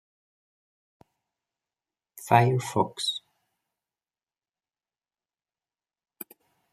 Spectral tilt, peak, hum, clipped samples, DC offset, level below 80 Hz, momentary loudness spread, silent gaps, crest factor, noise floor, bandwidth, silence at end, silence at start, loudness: -5 dB/octave; -4 dBFS; none; under 0.1%; under 0.1%; -70 dBFS; 23 LU; none; 28 dB; under -90 dBFS; 15 kHz; 3.55 s; 2.15 s; -25 LUFS